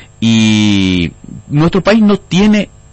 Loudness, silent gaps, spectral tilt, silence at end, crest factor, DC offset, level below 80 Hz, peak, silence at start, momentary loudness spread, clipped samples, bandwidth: -11 LUFS; none; -6 dB/octave; 0.3 s; 10 dB; under 0.1%; -36 dBFS; 0 dBFS; 0.2 s; 6 LU; under 0.1%; 8.4 kHz